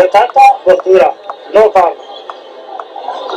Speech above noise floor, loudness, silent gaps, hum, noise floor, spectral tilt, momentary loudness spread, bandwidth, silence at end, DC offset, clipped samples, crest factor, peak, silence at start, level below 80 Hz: 22 dB; -8 LUFS; none; none; -29 dBFS; -4 dB/octave; 21 LU; 12.5 kHz; 0 s; under 0.1%; 2%; 10 dB; 0 dBFS; 0 s; -52 dBFS